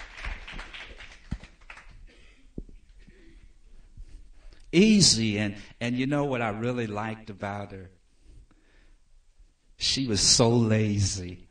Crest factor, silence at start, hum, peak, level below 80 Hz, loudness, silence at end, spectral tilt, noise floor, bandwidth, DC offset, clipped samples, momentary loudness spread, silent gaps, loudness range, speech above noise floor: 22 dB; 0 s; none; -6 dBFS; -46 dBFS; -24 LUFS; 0.05 s; -4 dB/octave; -58 dBFS; 13.5 kHz; under 0.1%; under 0.1%; 27 LU; none; 20 LU; 33 dB